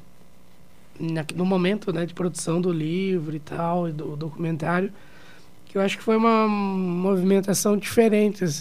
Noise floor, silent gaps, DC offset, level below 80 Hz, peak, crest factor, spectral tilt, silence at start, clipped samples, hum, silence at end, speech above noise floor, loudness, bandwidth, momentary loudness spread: -54 dBFS; none; 0.8%; -60 dBFS; -6 dBFS; 18 dB; -6 dB/octave; 1 s; under 0.1%; none; 0 s; 31 dB; -24 LUFS; 15.5 kHz; 10 LU